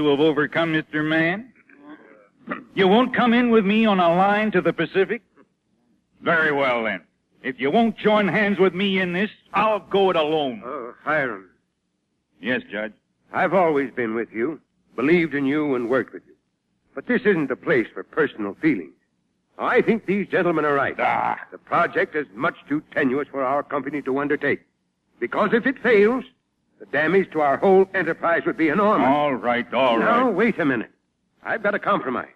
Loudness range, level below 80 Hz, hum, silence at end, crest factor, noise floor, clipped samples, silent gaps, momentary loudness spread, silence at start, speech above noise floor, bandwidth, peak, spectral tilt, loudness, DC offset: 5 LU; -64 dBFS; none; 0.1 s; 16 dB; -73 dBFS; under 0.1%; none; 11 LU; 0 s; 52 dB; 7.6 kHz; -6 dBFS; -7.5 dB/octave; -21 LUFS; under 0.1%